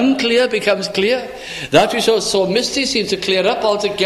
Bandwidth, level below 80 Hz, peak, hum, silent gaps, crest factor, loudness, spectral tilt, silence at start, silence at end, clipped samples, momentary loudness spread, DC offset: 15 kHz; -50 dBFS; 0 dBFS; none; none; 16 dB; -16 LUFS; -3.5 dB/octave; 0 s; 0 s; under 0.1%; 4 LU; under 0.1%